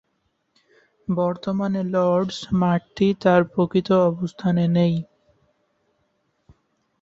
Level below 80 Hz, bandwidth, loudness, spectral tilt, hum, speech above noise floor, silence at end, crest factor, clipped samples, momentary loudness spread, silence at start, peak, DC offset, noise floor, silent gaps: -56 dBFS; 7.6 kHz; -21 LUFS; -8 dB/octave; none; 51 dB; 1.95 s; 20 dB; under 0.1%; 7 LU; 1.1 s; -4 dBFS; under 0.1%; -71 dBFS; none